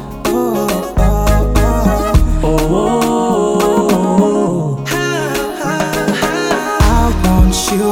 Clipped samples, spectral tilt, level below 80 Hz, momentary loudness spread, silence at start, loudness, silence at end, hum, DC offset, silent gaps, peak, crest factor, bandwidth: under 0.1%; -5.5 dB/octave; -18 dBFS; 5 LU; 0 s; -14 LUFS; 0 s; none; under 0.1%; none; 0 dBFS; 12 dB; 17.5 kHz